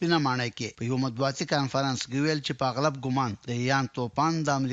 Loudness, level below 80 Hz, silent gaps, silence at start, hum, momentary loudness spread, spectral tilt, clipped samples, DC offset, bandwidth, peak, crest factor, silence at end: -28 LUFS; -64 dBFS; none; 0 s; none; 5 LU; -5 dB/octave; under 0.1%; under 0.1%; 8 kHz; -10 dBFS; 18 dB; 0 s